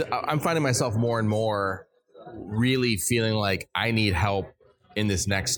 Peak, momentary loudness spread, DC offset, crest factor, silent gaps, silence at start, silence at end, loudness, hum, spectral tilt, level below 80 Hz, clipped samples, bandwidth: -8 dBFS; 10 LU; under 0.1%; 18 dB; none; 0 s; 0 s; -25 LUFS; none; -4.5 dB/octave; -48 dBFS; under 0.1%; 19 kHz